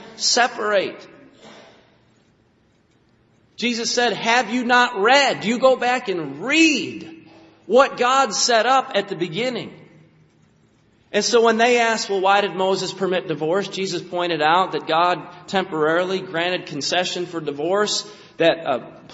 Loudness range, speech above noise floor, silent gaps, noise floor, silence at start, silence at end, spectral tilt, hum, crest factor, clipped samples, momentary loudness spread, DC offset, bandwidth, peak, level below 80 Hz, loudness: 6 LU; 40 dB; none; -60 dBFS; 0 s; 0 s; -1.5 dB/octave; none; 20 dB; under 0.1%; 10 LU; under 0.1%; 8 kHz; 0 dBFS; -66 dBFS; -19 LUFS